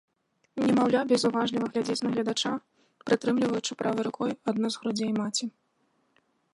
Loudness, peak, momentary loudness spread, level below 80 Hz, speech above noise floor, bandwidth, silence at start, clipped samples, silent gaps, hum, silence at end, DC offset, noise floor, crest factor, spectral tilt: -28 LUFS; -10 dBFS; 7 LU; -72 dBFS; 44 dB; 11.5 kHz; 0.55 s; under 0.1%; none; none; 1.05 s; under 0.1%; -72 dBFS; 18 dB; -4.5 dB/octave